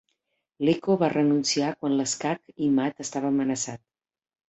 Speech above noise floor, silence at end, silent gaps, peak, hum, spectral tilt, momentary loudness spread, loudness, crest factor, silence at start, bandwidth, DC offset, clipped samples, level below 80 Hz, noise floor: 53 dB; 0.7 s; none; -10 dBFS; none; -4.5 dB/octave; 8 LU; -25 LUFS; 16 dB; 0.6 s; 8.2 kHz; under 0.1%; under 0.1%; -68 dBFS; -78 dBFS